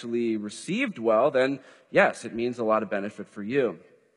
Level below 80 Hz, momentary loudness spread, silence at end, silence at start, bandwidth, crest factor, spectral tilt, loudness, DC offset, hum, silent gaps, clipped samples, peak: -72 dBFS; 11 LU; 0.4 s; 0 s; 11.5 kHz; 20 dB; -5.5 dB/octave; -26 LUFS; under 0.1%; none; none; under 0.1%; -6 dBFS